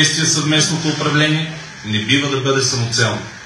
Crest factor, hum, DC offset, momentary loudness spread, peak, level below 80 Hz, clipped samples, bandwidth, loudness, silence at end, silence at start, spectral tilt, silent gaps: 16 dB; none; under 0.1%; 7 LU; 0 dBFS; -54 dBFS; under 0.1%; 12.5 kHz; -15 LUFS; 0 s; 0 s; -3 dB/octave; none